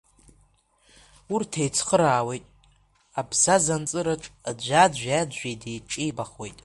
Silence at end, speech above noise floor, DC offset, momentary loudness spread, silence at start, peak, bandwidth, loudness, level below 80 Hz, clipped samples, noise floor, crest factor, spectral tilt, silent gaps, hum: 0.1 s; 38 dB; under 0.1%; 15 LU; 1.3 s; -4 dBFS; 11.5 kHz; -24 LUFS; -56 dBFS; under 0.1%; -62 dBFS; 22 dB; -3.5 dB/octave; none; none